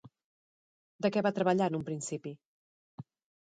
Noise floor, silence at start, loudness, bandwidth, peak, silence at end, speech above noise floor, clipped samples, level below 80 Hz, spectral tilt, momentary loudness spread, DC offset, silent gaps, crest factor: under -90 dBFS; 0.05 s; -32 LUFS; 9.4 kHz; -14 dBFS; 0.4 s; over 59 dB; under 0.1%; -76 dBFS; -5.5 dB/octave; 23 LU; under 0.1%; 0.24-0.99 s, 2.45-2.98 s; 20 dB